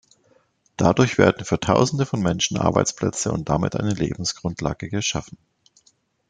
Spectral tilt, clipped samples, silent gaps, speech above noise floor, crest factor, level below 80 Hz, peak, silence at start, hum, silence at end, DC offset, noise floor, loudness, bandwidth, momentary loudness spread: -5 dB/octave; under 0.1%; none; 41 dB; 20 dB; -48 dBFS; -2 dBFS; 0.8 s; none; 1.05 s; under 0.1%; -62 dBFS; -22 LUFS; 9.6 kHz; 8 LU